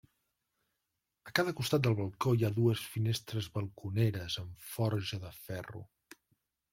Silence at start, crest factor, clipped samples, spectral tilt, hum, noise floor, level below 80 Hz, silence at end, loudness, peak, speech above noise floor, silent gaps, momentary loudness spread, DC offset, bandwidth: 1.25 s; 24 dB; under 0.1%; -6 dB/octave; none; -86 dBFS; -66 dBFS; 0.85 s; -34 LUFS; -10 dBFS; 53 dB; none; 13 LU; under 0.1%; 16.5 kHz